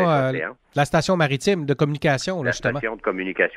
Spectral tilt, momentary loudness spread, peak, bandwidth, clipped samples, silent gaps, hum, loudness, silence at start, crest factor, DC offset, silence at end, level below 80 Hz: -5.5 dB/octave; 6 LU; -4 dBFS; 14 kHz; under 0.1%; none; none; -22 LUFS; 0 s; 18 dB; under 0.1%; 0 s; -50 dBFS